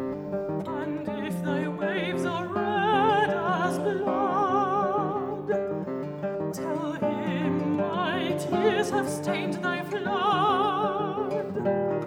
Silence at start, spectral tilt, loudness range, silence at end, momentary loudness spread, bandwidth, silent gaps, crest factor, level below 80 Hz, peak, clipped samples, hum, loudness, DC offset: 0 s; -6 dB/octave; 3 LU; 0 s; 8 LU; over 20 kHz; none; 16 dB; -66 dBFS; -10 dBFS; under 0.1%; none; -27 LUFS; under 0.1%